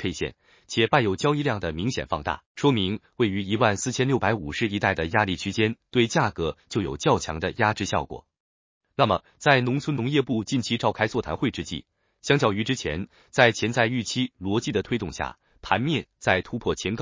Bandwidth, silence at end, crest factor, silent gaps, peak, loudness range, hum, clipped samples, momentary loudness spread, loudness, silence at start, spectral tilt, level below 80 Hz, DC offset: 7.8 kHz; 0 s; 22 dB; 2.46-2.55 s, 8.40-8.81 s; -2 dBFS; 2 LU; none; under 0.1%; 9 LU; -25 LUFS; 0 s; -5 dB/octave; -48 dBFS; under 0.1%